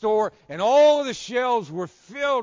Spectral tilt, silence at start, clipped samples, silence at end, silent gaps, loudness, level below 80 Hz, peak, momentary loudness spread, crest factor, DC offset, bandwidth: -4 dB/octave; 0 s; under 0.1%; 0 s; none; -21 LUFS; -64 dBFS; -10 dBFS; 16 LU; 12 dB; under 0.1%; 7.6 kHz